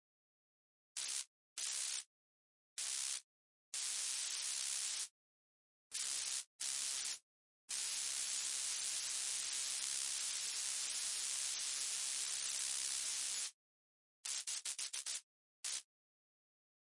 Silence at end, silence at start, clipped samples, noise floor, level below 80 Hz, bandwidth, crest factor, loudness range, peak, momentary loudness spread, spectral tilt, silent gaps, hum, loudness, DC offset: 1.15 s; 0.95 s; under 0.1%; under -90 dBFS; -90 dBFS; 11.5 kHz; 22 dB; 5 LU; -22 dBFS; 8 LU; 4.5 dB/octave; 1.27-1.56 s, 2.06-2.76 s, 3.24-3.72 s, 5.10-5.90 s, 6.47-6.59 s, 7.22-7.68 s, 13.54-14.23 s, 15.23-15.63 s; none; -40 LUFS; under 0.1%